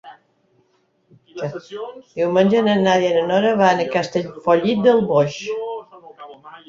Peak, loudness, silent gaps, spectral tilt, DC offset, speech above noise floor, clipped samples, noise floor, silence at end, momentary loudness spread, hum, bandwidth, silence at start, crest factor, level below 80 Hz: -2 dBFS; -18 LUFS; none; -6 dB/octave; under 0.1%; 45 dB; under 0.1%; -63 dBFS; 0.1 s; 17 LU; none; 7.6 kHz; 0.05 s; 16 dB; -60 dBFS